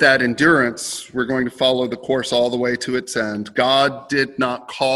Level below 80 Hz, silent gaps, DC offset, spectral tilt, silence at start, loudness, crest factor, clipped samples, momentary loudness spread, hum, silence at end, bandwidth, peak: -56 dBFS; none; under 0.1%; -3.5 dB/octave; 0 s; -19 LUFS; 18 dB; under 0.1%; 8 LU; none; 0 s; 16.5 kHz; 0 dBFS